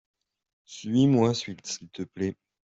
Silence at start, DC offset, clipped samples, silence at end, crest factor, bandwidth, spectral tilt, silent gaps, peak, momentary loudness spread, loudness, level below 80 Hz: 0.7 s; under 0.1%; under 0.1%; 0.4 s; 18 dB; 8 kHz; -6 dB/octave; none; -10 dBFS; 18 LU; -27 LUFS; -66 dBFS